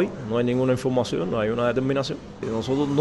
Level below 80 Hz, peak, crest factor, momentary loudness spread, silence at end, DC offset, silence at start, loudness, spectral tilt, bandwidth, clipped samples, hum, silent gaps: -50 dBFS; -10 dBFS; 14 dB; 7 LU; 0 s; under 0.1%; 0 s; -24 LUFS; -6.5 dB/octave; 11.5 kHz; under 0.1%; none; none